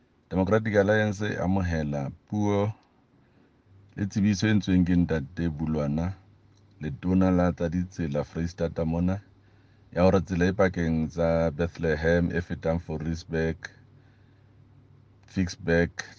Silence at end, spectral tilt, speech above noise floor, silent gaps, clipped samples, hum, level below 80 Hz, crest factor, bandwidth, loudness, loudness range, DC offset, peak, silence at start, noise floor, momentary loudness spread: 0.05 s; -7.5 dB/octave; 36 dB; none; under 0.1%; none; -50 dBFS; 20 dB; 7.2 kHz; -27 LUFS; 4 LU; under 0.1%; -8 dBFS; 0.3 s; -62 dBFS; 10 LU